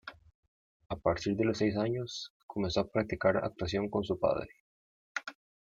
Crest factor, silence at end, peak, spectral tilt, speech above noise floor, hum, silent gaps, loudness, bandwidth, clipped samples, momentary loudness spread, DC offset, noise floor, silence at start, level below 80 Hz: 20 dB; 0.35 s; -14 dBFS; -6 dB/octave; over 58 dB; none; 0.35-0.80 s, 0.86-0.90 s, 2.30-2.49 s, 4.60-5.15 s; -33 LUFS; 7.8 kHz; under 0.1%; 12 LU; under 0.1%; under -90 dBFS; 0.05 s; -58 dBFS